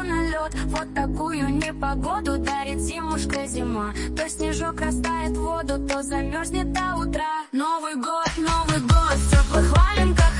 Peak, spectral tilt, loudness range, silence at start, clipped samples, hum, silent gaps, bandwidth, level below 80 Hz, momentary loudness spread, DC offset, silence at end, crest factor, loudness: -6 dBFS; -5 dB/octave; 5 LU; 0 s; under 0.1%; none; none; 11.5 kHz; -26 dBFS; 8 LU; under 0.1%; 0 s; 16 dB; -24 LUFS